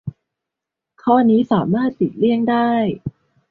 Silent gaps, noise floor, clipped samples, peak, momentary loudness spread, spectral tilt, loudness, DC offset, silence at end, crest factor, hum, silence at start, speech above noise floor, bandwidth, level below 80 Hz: none; -84 dBFS; under 0.1%; -2 dBFS; 14 LU; -10 dB/octave; -17 LUFS; under 0.1%; 0.4 s; 16 dB; none; 0.05 s; 68 dB; 4.5 kHz; -54 dBFS